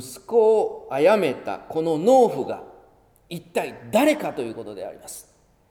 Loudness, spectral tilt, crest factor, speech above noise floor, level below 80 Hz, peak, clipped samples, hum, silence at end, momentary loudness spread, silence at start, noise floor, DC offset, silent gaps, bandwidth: -21 LUFS; -5 dB/octave; 18 dB; 34 dB; -64 dBFS; -6 dBFS; under 0.1%; none; 0.5 s; 19 LU; 0 s; -56 dBFS; under 0.1%; none; 18.5 kHz